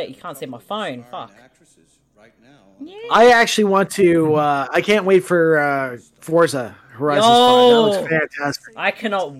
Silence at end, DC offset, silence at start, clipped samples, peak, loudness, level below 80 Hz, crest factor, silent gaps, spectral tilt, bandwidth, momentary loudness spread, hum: 0 s; under 0.1%; 0 s; under 0.1%; -4 dBFS; -16 LUFS; -60 dBFS; 14 dB; none; -4.5 dB/octave; 16.5 kHz; 20 LU; none